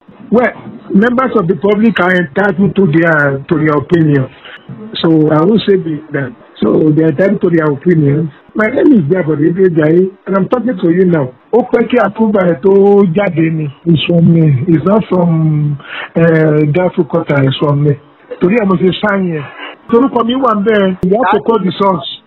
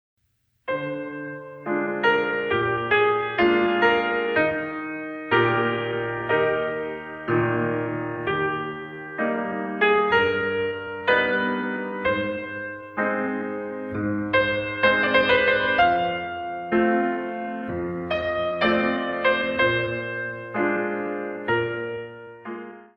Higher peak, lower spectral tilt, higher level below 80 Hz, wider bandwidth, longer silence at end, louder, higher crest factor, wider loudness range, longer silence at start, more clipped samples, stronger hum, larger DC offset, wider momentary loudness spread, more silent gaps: first, 0 dBFS vs -6 dBFS; first, -9.5 dB/octave vs -7.5 dB/octave; first, -46 dBFS vs -56 dBFS; second, 4.6 kHz vs 6.6 kHz; about the same, 0.1 s vs 0.15 s; first, -11 LUFS vs -23 LUFS; second, 10 dB vs 18 dB; about the same, 2 LU vs 4 LU; second, 0.25 s vs 0.65 s; first, 0.5% vs under 0.1%; neither; neither; second, 8 LU vs 12 LU; neither